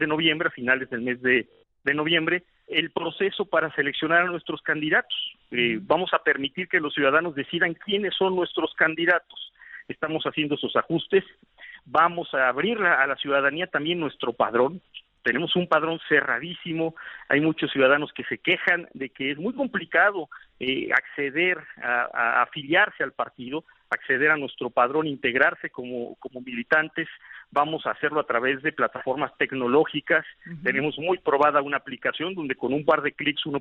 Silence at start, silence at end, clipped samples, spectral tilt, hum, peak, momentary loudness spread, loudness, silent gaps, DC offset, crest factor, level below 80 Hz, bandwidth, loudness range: 0 s; 0 s; under 0.1%; -2 dB/octave; none; -6 dBFS; 10 LU; -24 LUFS; none; under 0.1%; 20 dB; -66 dBFS; 5.8 kHz; 2 LU